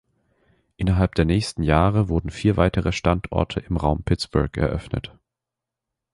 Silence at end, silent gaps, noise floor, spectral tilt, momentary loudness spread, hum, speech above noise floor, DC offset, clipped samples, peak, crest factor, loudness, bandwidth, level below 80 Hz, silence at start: 1.05 s; none; -86 dBFS; -7 dB/octave; 7 LU; none; 65 dB; under 0.1%; under 0.1%; -4 dBFS; 20 dB; -22 LUFS; 11.5 kHz; -32 dBFS; 0.8 s